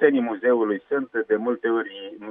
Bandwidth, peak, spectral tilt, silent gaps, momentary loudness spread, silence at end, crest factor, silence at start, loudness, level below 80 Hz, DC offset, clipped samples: 3.7 kHz; -6 dBFS; -9 dB/octave; none; 6 LU; 0 s; 18 dB; 0 s; -23 LUFS; -80 dBFS; under 0.1%; under 0.1%